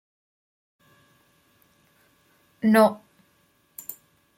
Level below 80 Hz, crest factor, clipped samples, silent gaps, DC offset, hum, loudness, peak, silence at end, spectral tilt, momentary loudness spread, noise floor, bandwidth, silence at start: -74 dBFS; 22 dB; under 0.1%; none; under 0.1%; none; -21 LUFS; -6 dBFS; 0.45 s; -6 dB/octave; 26 LU; -65 dBFS; 16.5 kHz; 2.65 s